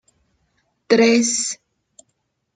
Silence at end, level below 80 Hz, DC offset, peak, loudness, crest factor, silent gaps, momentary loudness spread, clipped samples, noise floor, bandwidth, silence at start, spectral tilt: 1 s; -68 dBFS; under 0.1%; -2 dBFS; -17 LUFS; 20 dB; none; 12 LU; under 0.1%; -72 dBFS; 9.4 kHz; 0.9 s; -2.5 dB/octave